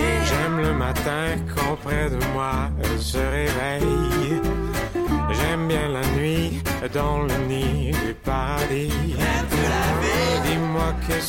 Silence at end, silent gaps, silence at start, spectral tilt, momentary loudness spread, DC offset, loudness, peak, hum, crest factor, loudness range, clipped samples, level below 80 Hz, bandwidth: 0 s; none; 0 s; -5.5 dB/octave; 4 LU; under 0.1%; -23 LUFS; -10 dBFS; none; 12 dB; 1 LU; under 0.1%; -30 dBFS; 17 kHz